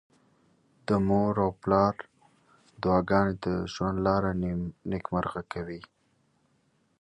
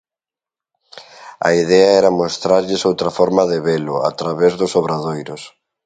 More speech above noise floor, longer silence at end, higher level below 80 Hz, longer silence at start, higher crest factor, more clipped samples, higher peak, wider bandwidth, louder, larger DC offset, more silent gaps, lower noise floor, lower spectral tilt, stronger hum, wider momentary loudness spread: second, 43 dB vs 74 dB; first, 1.2 s vs 0.35 s; about the same, -50 dBFS vs -54 dBFS; about the same, 0.9 s vs 0.95 s; about the same, 20 dB vs 16 dB; neither; second, -10 dBFS vs 0 dBFS; about the same, 9 kHz vs 9.4 kHz; second, -28 LUFS vs -16 LUFS; neither; neither; second, -70 dBFS vs -89 dBFS; first, -8 dB/octave vs -5 dB/octave; neither; about the same, 12 LU vs 12 LU